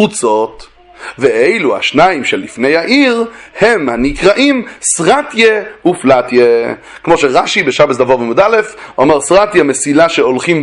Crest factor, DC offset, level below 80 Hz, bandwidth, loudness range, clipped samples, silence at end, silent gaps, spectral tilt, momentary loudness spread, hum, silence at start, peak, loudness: 10 dB; under 0.1%; -40 dBFS; 11.5 kHz; 1 LU; 0.3%; 0 s; none; -3.5 dB/octave; 6 LU; none; 0 s; 0 dBFS; -10 LUFS